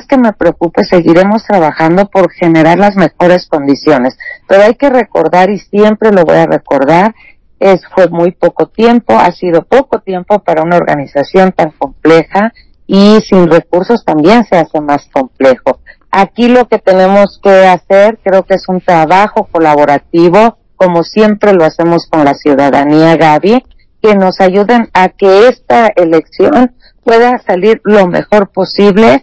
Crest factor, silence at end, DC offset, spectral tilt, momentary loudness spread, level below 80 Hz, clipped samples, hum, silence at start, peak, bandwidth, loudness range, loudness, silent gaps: 6 dB; 0.05 s; under 0.1%; -7 dB/octave; 6 LU; -42 dBFS; 10%; none; 0.1 s; 0 dBFS; 8 kHz; 2 LU; -7 LUFS; none